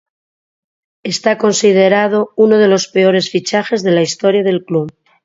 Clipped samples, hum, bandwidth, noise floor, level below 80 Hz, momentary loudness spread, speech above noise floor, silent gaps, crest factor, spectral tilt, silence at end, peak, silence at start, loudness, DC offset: under 0.1%; none; 7.8 kHz; under -90 dBFS; -62 dBFS; 9 LU; over 78 dB; none; 14 dB; -4.5 dB/octave; 0.35 s; 0 dBFS; 1.05 s; -13 LUFS; under 0.1%